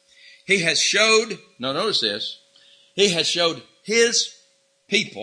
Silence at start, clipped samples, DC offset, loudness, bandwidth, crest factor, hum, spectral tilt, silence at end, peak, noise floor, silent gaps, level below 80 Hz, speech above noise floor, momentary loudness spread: 0.5 s; under 0.1%; under 0.1%; -20 LUFS; 11 kHz; 18 dB; none; -1.5 dB/octave; 0 s; -4 dBFS; -61 dBFS; none; -68 dBFS; 40 dB; 13 LU